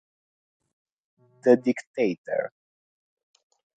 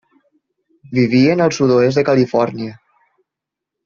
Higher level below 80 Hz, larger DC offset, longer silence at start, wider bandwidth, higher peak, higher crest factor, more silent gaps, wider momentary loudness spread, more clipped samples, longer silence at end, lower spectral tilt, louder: second, -80 dBFS vs -56 dBFS; neither; first, 1.45 s vs 0.9 s; first, 9 kHz vs 7.4 kHz; second, -6 dBFS vs -2 dBFS; first, 24 dB vs 14 dB; first, 1.87-1.94 s, 2.18-2.24 s vs none; about the same, 9 LU vs 10 LU; neither; first, 1.3 s vs 1.1 s; about the same, -6.5 dB/octave vs -6 dB/octave; second, -25 LUFS vs -15 LUFS